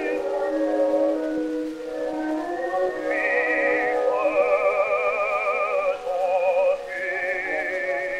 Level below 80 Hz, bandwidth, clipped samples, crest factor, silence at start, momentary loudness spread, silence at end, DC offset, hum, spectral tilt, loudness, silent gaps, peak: -58 dBFS; 11 kHz; under 0.1%; 14 dB; 0 s; 7 LU; 0 s; under 0.1%; none; -4.5 dB/octave; -23 LUFS; none; -8 dBFS